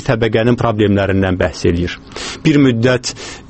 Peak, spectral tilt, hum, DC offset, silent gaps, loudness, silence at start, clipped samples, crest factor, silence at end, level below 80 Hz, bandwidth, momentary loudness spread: 0 dBFS; -6 dB/octave; none; under 0.1%; none; -14 LUFS; 0 s; under 0.1%; 14 dB; 0.05 s; -36 dBFS; 8.8 kHz; 11 LU